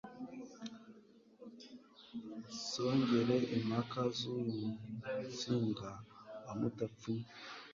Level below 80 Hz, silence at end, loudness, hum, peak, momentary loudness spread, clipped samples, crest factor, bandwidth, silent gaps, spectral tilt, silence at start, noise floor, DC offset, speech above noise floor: -72 dBFS; 0 s; -39 LUFS; none; -22 dBFS; 21 LU; under 0.1%; 18 dB; 7.4 kHz; none; -5.5 dB/octave; 0.05 s; -63 dBFS; under 0.1%; 25 dB